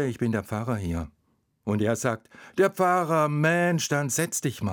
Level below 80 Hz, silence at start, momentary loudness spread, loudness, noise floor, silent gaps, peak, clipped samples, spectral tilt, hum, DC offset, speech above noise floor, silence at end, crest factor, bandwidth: -56 dBFS; 0 s; 12 LU; -25 LUFS; -70 dBFS; none; -10 dBFS; under 0.1%; -5 dB/octave; none; under 0.1%; 45 dB; 0 s; 16 dB; 19.5 kHz